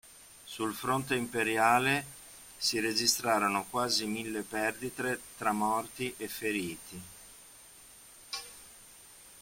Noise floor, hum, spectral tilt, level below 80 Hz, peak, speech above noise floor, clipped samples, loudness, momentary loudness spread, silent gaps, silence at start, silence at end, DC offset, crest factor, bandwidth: -54 dBFS; none; -2.5 dB/octave; -66 dBFS; -12 dBFS; 23 dB; under 0.1%; -31 LUFS; 24 LU; none; 0.05 s; 0 s; under 0.1%; 22 dB; 16.5 kHz